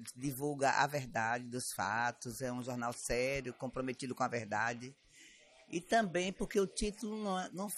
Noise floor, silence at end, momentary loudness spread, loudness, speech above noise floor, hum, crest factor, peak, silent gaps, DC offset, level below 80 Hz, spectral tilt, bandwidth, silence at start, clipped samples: -61 dBFS; 0 s; 8 LU; -37 LUFS; 24 dB; none; 22 dB; -16 dBFS; none; under 0.1%; -58 dBFS; -4 dB/octave; 14.5 kHz; 0 s; under 0.1%